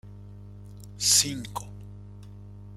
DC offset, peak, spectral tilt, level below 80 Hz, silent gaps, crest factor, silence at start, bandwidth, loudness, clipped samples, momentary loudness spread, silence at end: under 0.1%; -8 dBFS; -1 dB/octave; -52 dBFS; none; 24 dB; 0.05 s; 16 kHz; -22 LUFS; under 0.1%; 26 LU; 0 s